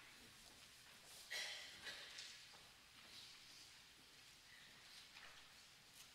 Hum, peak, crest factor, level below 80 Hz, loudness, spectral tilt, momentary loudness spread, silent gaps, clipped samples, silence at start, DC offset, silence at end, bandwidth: none; -36 dBFS; 24 dB; -84 dBFS; -56 LUFS; 0 dB/octave; 13 LU; none; under 0.1%; 0 s; under 0.1%; 0 s; 16 kHz